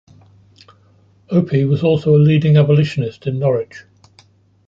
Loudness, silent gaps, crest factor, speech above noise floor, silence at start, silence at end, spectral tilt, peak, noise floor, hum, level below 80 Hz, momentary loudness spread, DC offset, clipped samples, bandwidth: -15 LUFS; none; 14 dB; 38 dB; 1.3 s; 0.85 s; -9 dB/octave; -2 dBFS; -52 dBFS; none; -52 dBFS; 10 LU; under 0.1%; under 0.1%; 7.2 kHz